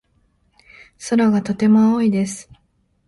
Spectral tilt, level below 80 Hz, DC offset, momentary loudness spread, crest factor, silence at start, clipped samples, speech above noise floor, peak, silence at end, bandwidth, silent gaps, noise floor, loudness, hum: -6.5 dB/octave; -56 dBFS; under 0.1%; 15 LU; 14 dB; 1 s; under 0.1%; 47 dB; -6 dBFS; 0.65 s; 11.5 kHz; none; -63 dBFS; -17 LUFS; none